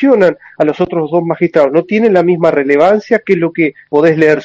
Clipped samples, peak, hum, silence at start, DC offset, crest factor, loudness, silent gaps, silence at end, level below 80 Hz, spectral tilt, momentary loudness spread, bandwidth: 0.4%; 0 dBFS; none; 0 s; under 0.1%; 10 dB; -11 LUFS; none; 0 s; -54 dBFS; -8 dB/octave; 5 LU; 7.8 kHz